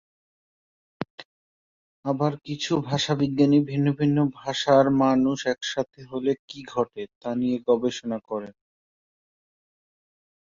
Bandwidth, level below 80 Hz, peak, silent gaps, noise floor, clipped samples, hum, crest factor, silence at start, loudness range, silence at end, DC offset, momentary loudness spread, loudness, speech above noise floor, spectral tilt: 7.6 kHz; -62 dBFS; -6 dBFS; 1.10-1.18 s, 1.25-2.03 s, 6.39-6.48 s, 7.15-7.21 s; under -90 dBFS; under 0.1%; none; 20 dB; 1 s; 8 LU; 1.95 s; under 0.1%; 14 LU; -24 LUFS; over 66 dB; -6 dB/octave